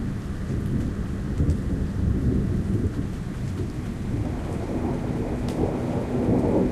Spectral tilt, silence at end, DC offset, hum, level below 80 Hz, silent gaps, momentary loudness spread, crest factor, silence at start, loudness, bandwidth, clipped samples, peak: -8.5 dB/octave; 0 s; under 0.1%; none; -32 dBFS; none; 7 LU; 14 dB; 0 s; -27 LUFS; 13 kHz; under 0.1%; -10 dBFS